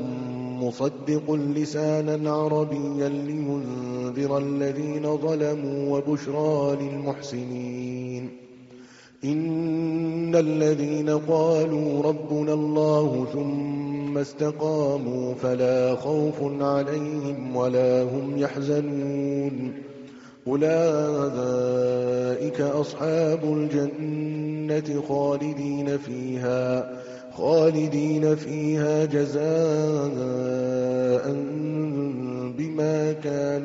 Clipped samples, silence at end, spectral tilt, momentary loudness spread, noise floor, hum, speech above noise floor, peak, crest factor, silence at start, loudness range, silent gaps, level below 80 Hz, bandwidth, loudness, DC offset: under 0.1%; 0 s; -7.5 dB/octave; 8 LU; -48 dBFS; none; 24 dB; -8 dBFS; 16 dB; 0 s; 4 LU; none; -66 dBFS; 7.6 kHz; -25 LUFS; under 0.1%